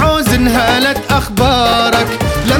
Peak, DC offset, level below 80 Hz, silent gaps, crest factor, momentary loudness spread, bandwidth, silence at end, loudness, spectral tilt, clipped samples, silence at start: 0 dBFS; 0.2%; -24 dBFS; none; 12 dB; 4 LU; 19.5 kHz; 0 s; -12 LUFS; -4.5 dB/octave; under 0.1%; 0 s